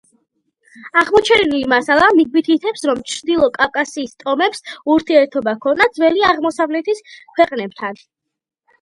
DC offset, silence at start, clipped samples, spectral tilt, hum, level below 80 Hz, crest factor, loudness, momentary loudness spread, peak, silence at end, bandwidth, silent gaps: under 0.1%; 0.8 s; under 0.1%; -3.5 dB/octave; none; -52 dBFS; 16 dB; -15 LUFS; 12 LU; 0 dBFS; 0.85 s; 11.5 kHz; none